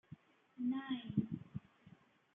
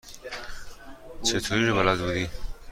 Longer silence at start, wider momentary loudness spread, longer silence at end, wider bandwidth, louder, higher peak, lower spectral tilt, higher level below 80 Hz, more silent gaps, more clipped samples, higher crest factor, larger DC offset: about the same, 0.1 s vs 0.05 s; second, 18 LU vs 23 LU; first, 0.45 s vs 0 s; second, 3.8 kHz vs 16.5 kHz; second, -43 LUFS vs -25 LUFS; second, -22 dBFS vs -8 dBFS; first, -9 dB/octave vs -4 dB/octave; second, -76 dBFS vs -42 dBFS; neither; neither; about the same, 22 dB vs 20 dB; neither